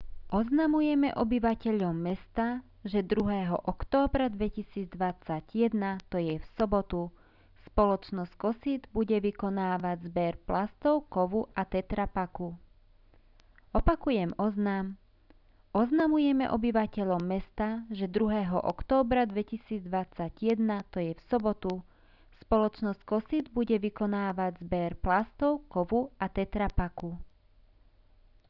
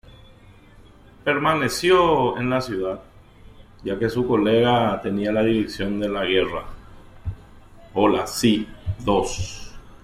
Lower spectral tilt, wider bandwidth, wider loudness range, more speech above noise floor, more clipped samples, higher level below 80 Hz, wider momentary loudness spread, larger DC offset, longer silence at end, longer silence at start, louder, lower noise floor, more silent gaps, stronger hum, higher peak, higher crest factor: first, -9.5 dB/octave vs -5 dB/octave; second, 6 kHz vs 16 kHz; about the same, 4 LU vs 3 LU; about the same, 31 dB vs 28 dB; neither; about the same, -44 dBFS vs -44 dBFS; second, 8 LU vs 16 LU; neither; first, 1.25 s vs 0.05 s; second, 0 s vs 1.25 s; second, -31 LUFS vs -21 LUFS; first, -61 dBFS vs -48 dBFS; neither; neither; second, -12 dBFS vs -6 dBFS; about the same, 18 dB vs 18 dB